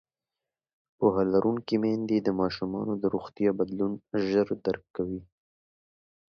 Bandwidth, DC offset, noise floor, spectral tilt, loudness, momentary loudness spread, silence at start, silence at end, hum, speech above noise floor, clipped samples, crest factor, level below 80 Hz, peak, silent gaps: 6.6 kHz; under 0.1%; under -90 dBFS; -8.5 dB/octave; -28 LUFS; 8 LU; 1 s; 1.15 s; none; over 63 dB; under 0.1%; 20 dB; -60 dBFS; -10 dBFS; none